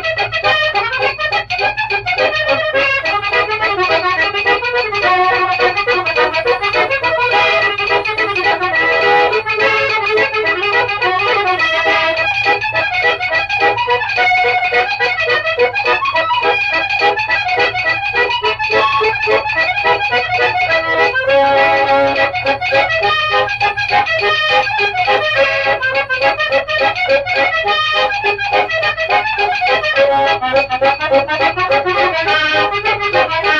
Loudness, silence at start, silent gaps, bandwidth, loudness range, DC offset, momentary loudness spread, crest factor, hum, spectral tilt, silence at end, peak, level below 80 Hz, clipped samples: -13 LUFS; 0 s; none; 9.6 kHz; 1 LU; under 0.1%; 3 LU; 12 dB; none; -3.5 dB/octave; 0 s; -2 dBFS; -44 dBFS; under 0.1%